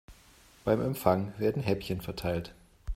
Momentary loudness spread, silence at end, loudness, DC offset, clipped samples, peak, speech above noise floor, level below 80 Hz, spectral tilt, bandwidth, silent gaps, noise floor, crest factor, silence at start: 9 LU; 0 s; -31 LUFS; under 0.1%; under 0.1%; -8 dBFS; 28 dB; -46 dBFS; -7 dB/octave; 16 kHz; none; -58 dBFS; 24 dB; 0.1 s